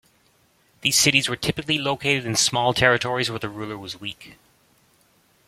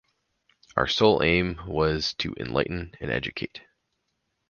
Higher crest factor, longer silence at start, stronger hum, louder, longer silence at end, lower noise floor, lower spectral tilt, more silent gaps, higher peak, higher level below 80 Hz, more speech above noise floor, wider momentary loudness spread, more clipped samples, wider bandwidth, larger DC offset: about the same, 22 dB vs 24 dB; about the same, 0.85 s vs 0.75 s; neither; first, -21 LUFS vs -25 LUFS; first, 1.15 s vs 0.9 s; second, -61 dBFS vs -77 dBFS; second, -2.5 dB/octave vs -5.5 dB/octave; neither; about the same, -2 dBFS vs -4 dBFS; second, -54 dBFS vs -46 dBFS; second, 39 dB vs 52 dB; about the same, 15 LU vs 13 LU; neither; first, 16.5 kHz vs 7.2 kHz; neither